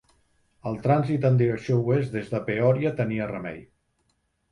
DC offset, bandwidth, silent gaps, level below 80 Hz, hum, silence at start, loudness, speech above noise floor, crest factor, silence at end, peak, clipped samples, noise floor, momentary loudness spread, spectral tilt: under 0.1%; 9.8 kHz; none; -58 dBFS; none; 0.65 s; -25 LUFS; 48 dB; 16 dB; 0.9 s; -8 dBFS; under 0.1%; -72 dBFS; 13 LU; -9 dB/octave